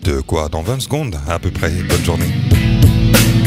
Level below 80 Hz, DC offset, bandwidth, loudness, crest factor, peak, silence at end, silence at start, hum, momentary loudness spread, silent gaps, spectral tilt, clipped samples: -22 dBFS; under 0.1%; 16 kHz; -15 LUFS; 14 dB; 0 dBFS; 0 s; 0 s; none; 9 LU; none; -5.5 dB/octave; under 0.1%